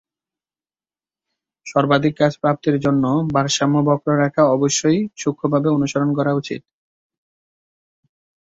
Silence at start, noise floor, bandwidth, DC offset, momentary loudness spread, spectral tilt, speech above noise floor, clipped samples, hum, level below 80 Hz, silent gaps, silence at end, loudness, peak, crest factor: 1.65 s; under -90 dBFS; 8 kHz; under 0.1%; 7 LU; -5.5 dB/octave; over 73 dB; under 0.1%; none; -56 dBFS; none; 1.85 s; -18 LUFS; -2 dBFS; 18 dB